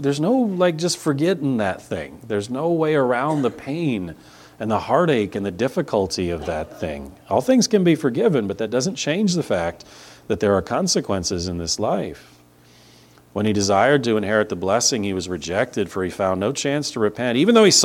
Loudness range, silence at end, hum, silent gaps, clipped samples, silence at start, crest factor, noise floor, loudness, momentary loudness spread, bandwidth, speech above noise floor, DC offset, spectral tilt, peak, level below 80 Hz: 3 LU; 0 s; none; none; under 0.1%; 0 s; 20 dB; -51 dBFS; -21 LUFS; 10 LU; 16.5 kHz; 31 dB; under 0.1%; -4.5 dB/octave; -2 dBFS; -50 dBFS